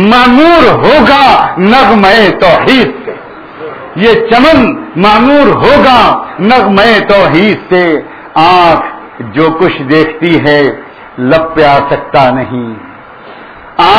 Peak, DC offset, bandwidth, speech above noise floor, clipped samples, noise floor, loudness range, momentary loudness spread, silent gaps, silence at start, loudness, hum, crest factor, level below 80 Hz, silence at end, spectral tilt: 0 dBFS; under 0.1%; 5.4 kHz; 24 dB; 5%; -29 dBFS; 4 LU; 16 LU; none; 0 s; -6 LUFS; none; 6 dB; -32 dBFS; 0 s; -7 dB/octave